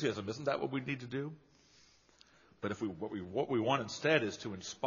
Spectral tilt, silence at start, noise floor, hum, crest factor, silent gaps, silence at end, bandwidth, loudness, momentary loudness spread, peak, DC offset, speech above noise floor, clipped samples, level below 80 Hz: -4 dB/octave; 0 s; -65 dBFS; none; 22 dB; none; 0 s; 7.2 kHz; -36 LUFS; 12 LU; -14 dBFS; under 0.1%; 29 dB; under 0.1%; -74 dBFS